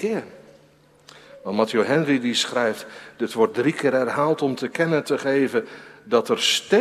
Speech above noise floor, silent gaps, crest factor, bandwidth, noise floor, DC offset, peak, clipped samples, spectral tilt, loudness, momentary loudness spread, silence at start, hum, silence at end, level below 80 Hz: 33 dB; none; 18 dB; 15.5 kHz; -55 dBFS; under 0.1%; -4 dBFS; under 0.1%; -4 dB/octave; -22 LUFS; 11 LU; 0 s; none; 0 s; -70 dBFS